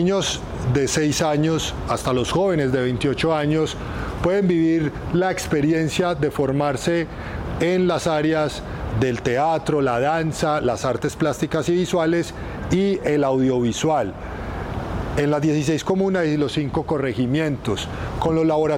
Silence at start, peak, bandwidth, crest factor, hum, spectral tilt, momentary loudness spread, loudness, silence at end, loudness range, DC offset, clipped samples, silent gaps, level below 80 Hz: 0 s; -8 dBFS; 16.5 kHz; 12 dB; none; -5.5 dB/octave; 7 LU; -21 LUFS; 0 s; 1 LU; under 0.1%; under 0.1%; none; -38 dBFS